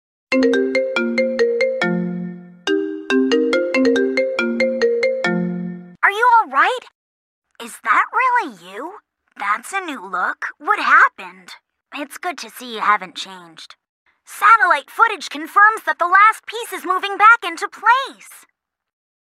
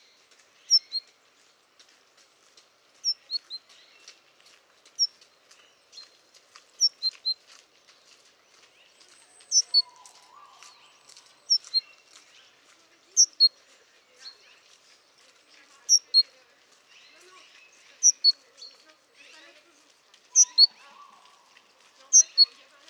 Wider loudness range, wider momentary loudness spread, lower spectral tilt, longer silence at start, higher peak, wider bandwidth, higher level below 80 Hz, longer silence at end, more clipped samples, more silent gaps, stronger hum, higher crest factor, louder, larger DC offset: second, 6 LU vs 12 LU; about the same, 18 LU vs 20 LU; first, -4.5 dB/octave vs 6 dB/octave; second, 0.3 s vs 0.7 s; first, 0 dBFS vs -6 dBFS; first, 15.5 kHz vs 13.5 kHz; first, -68 dBFS vs under -90 dBFS; first, 0.85 s vs 0.45 s; neither; first, 6.95-7.42 s, 13.89-14.06 s vs none; neither; second, 18 dB vs 24 dB; first, -17 LUFS vs -21 LUFS; neither